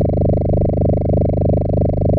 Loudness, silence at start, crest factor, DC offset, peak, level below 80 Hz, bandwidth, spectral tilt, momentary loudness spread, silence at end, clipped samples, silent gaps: -16 LUFS; 0 s; 8 dB; under 0.1%; -8 dBFS; -24 dBFS; 2.5 kHz; -14 dB/octave; 1 LU; 0 s; under 0.1%; none